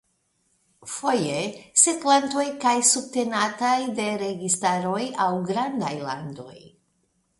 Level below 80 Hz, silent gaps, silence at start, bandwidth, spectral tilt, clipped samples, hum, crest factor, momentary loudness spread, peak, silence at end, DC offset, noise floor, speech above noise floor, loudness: -68 dBFS; none; 0.85 s; 12 kHz; -2.5 dB/octave; under 0.1%; none; 22 dB; 13 LU; -2 dBFS; 0.7 s; under 0.1%; -70 dBFS; 46 dB; -23 LUFS